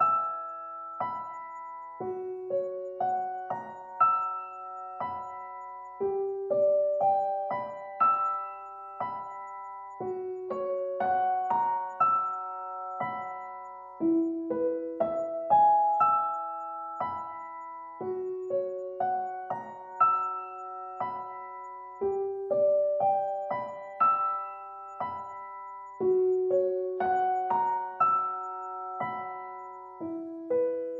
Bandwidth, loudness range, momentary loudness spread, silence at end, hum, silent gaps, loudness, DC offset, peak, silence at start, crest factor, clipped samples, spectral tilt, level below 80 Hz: 7.4 kHz; 5 LU; 16 LU; 0 s; none; none; -30 LUFS; under 0.1%; -12 dBFS; 0 s; 18 dB; under 0.1%; -8 dB/octave; -76 dBFS